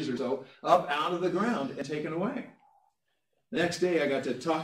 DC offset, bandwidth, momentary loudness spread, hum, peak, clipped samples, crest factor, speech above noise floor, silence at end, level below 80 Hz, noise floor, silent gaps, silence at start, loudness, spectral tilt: under 0.1%; 15 kHz; 9 LU; none; -8 dBFS; under 0.1%; 22 dB; 50 dB; 0 s; -74 dBFS; -79 dBFS; none; 0 s; -30 LUFS; -5.5 dB/octave